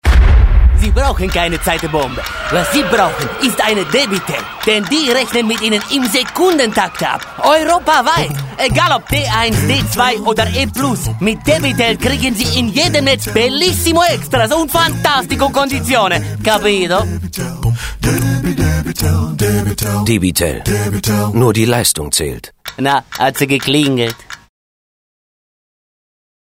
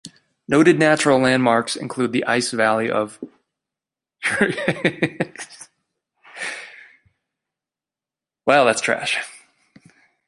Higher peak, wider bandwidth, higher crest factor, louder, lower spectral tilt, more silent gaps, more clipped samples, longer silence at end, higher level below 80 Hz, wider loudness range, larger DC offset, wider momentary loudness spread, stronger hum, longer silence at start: about the same, 0 dBFS vs -2 dBFS; first, 16.5 kHz vs 11.5 kHz; second, 14 dB vs 20 dB; first, -13 LUFS vs -19 LUFS; about the same, -4 dB/octave vs -4.5 dB/octave; neither; neither; first, 2.15 s vs 0.95 s; first, -22 dBFS vs -62 dBFS; second, 3 LU vs 11 LU; neither; second, 6 LU vs 17 LU; neither; about the same, 0.05 s vs 0.05 s